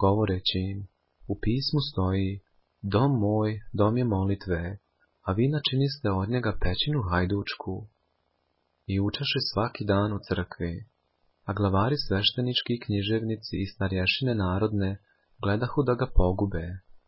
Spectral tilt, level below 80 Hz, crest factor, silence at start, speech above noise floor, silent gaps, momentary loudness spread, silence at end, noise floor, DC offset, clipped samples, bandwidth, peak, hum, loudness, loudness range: -10 dB/octave; -40 dBFS; 22 dB; 0 s; 48 dB; none; 11 LU; 0.1 s; -74 dBFS; under 0.1%; under 0.1%; 5.8 kHz; -6 dBFS; none; -27 LUFS; 3 LU